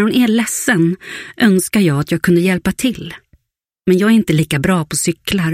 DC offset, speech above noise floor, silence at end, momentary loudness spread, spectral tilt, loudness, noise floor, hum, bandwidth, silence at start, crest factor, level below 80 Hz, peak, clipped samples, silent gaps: under 0.1%; 59 dB; 0 s; 8 LU; -5 dB/octave; -15 LUFS; -73 dBFS; none; 16 kHz; 0 s; 14 dB; -44 dBFS; 0 dBFS; under 0.1%; none